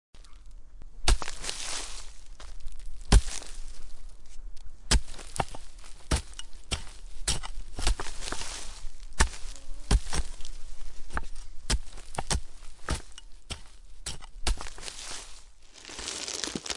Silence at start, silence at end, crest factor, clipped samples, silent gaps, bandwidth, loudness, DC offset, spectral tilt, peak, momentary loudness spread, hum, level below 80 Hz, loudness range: 0.15 s; 0 s; 22 dB; under 0.1%; none; 11.5 kHz; -33 LUFS; under 0.1%; -3 dB/octave; -6 dBFS; 22 LU; none; -34 dBFS; 5 LU